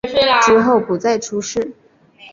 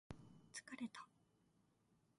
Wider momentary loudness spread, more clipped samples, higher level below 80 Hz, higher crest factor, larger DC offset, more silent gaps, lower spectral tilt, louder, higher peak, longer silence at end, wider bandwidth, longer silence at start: first, 12 LU vs 9 LU; neither; first, -50 dBFS vs -78 dBFS; second, 14 dB vs 22 dB; neither; neither; about the same, -3.5 dB/octave vs -3.5 dB/octave; first, -15 LUFS vs -55 LUFS; first, -2 dBFS vs -36 dBFS; second, 0.05 s vs 0.2 s; second, 7.6 kHz vs 11.5 kHz; about the same, 0.05 s vs 0.1 s